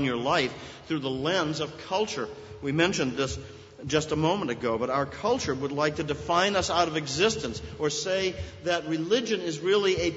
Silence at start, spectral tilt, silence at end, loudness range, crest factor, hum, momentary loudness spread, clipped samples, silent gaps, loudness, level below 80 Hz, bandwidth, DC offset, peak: 0 s; -4 dB/octave; 0 s; 2 LU; 20 dB; none; 9 LU; under 0.1%; none; -27 LUFS; -52 dBFS; 8 kHz; under 0.1%; -8 dBFS